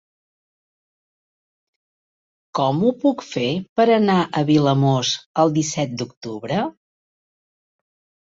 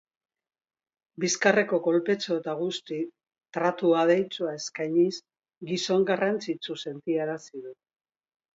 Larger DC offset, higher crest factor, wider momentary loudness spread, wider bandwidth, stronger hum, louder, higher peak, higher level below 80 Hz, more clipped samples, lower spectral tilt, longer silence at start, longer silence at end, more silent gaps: neither; about the same, 18 dB vs 22 dB; second, 11 LU vs 15 LU; about the same, 7.8 kHz vs 7.8 kHz; neither; first, -20 LUFS vs -27 LUFS; about the same, -4 dBFS vs -6 dBFS; first, -62 dBFS vs -78 dBFS; neither; about the same, -5.5 dB/octave vs -4.5 dB/octave; first, 2.55 s vs 1.2 s; first, 1.55 s vs 0.8 s; first, 3.69-3.76 s, 5.26-5.34 s, 6.17-6.21 s vs none